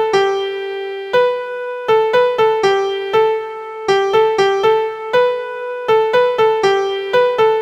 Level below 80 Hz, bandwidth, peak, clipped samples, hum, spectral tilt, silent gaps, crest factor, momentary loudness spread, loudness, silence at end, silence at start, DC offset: -58 dBFS; 15 kHz; -2 dBFS; under 0.1%; none; -4 dB/octave; none; 14 dB; 9 LU; -16 LUFS; 0 s; 0 s; under 0.1%